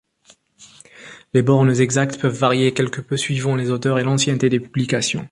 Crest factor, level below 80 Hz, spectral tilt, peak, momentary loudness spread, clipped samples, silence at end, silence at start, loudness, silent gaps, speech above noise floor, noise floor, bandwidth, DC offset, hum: 16 dB; -56 dBFS; -5.5 dB/octave; -2 dBFS; 6 LU; under 0.1%; 0.05 s; 0.6 s; -19 LUFS; none; 37 dB; -55 dBFS; 11.5 kHz; under 0.1%; none